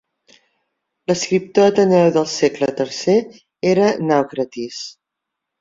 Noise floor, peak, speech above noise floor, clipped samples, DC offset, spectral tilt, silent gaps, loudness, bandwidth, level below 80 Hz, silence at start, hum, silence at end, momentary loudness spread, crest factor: -81 dBFS; -2 dBFS; 64 dB; under 0.1%; under 0.1%; -5 dB/octave; none; -17 LUFS; 7.8 kHz; -62 dBFS; 1.1 s; none; 0.7 s; 15 LU; 16 dB